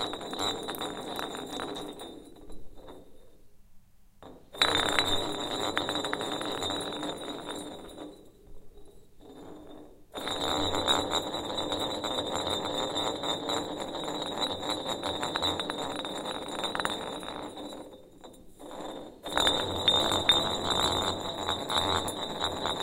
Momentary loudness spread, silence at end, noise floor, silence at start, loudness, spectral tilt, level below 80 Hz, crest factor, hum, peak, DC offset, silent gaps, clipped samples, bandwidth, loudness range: 20 LU; 0 s; -53 dBFS; 0 s; -30 LUFS; -2.5 dB/octave; -54 dBFS; 30 dB; none; -4 dBFS; under 0.1%; none; under 0.1%; 16.5 kHz; 12 LU